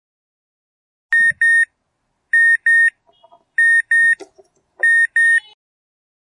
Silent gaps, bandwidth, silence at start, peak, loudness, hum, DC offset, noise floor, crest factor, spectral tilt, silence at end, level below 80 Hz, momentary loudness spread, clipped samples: none; 9.8 kHz; 1.1 s; -8 dBFS; -13 LUFS; none; under 0.1%; -70 dBFS; 10 dB; 0.5 dB/octave; 1 s; -74 dBFS; 6 LU; under 0.1%